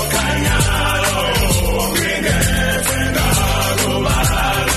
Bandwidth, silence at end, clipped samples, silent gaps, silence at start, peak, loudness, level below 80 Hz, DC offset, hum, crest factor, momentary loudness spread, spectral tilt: 13 kHz; 0 s; under 0.1%; none; 0 s; -2 dBFS; -16 LUFS; -22 dBFS; under 0.1%; none; 14 dB; 1 LU; -3.5 dB/octave